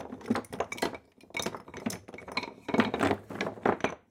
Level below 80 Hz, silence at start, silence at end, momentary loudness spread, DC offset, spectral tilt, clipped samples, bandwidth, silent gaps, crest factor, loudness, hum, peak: -62 dBFS; 0 s; 0.1 s; 9 LU; under 0.1%; -4.5 dB/octave; under 0.1%; 17 kHz; none; 24 dB; -33 LUFS; none; -8 dBFS